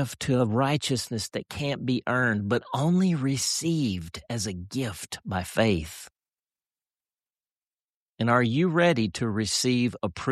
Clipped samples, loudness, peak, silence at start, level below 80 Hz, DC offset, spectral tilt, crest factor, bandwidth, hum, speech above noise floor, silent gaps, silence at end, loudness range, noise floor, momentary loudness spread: under 0.1%; -26 LUFS; -8 dBFS; 0 s; -54 dBFS; under 0.1%; -5 dB/octave; 18 dB; 14 kHz; none; over 64 dB; 7.57-7.71 s, 7.84-8.13 s; 0 s; 6 LU; under -90 dBFS; 9 LU